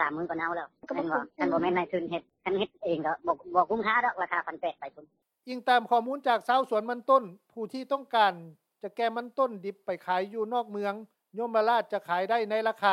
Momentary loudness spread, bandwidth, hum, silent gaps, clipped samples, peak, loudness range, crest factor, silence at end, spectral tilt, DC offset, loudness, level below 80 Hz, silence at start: 12 LU; 13.5 kHz; none; none; under 0.1%; -10 dBFS; 3 LU; 18 dB; 0 s; -6 dB/octave; under 0.1%; -29 LUFS; -72 dBFS; 0 s